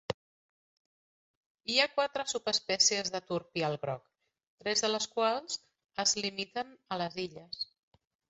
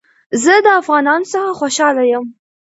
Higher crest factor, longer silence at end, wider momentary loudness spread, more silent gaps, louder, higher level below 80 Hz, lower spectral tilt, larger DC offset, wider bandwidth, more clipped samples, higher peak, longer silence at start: first, 22 dB vs 14 dB; first, 0.65 s vs 0.45 s; first, 14 LU vs 10 LU; first, 0.14-1.55 s, 4.47-4.58 s vs none; second, -32 LUFS vs -13 LUFS; second, -72 dBFS vs -66 dBFS; second, -1 dB/octave vs -2.5 dB/octave; neither; about the same, 8 kHz vs 8.2 kHz; neither; second, -12 dBFS vs 0 dBFS; second, 0.1 s vs 0.3 s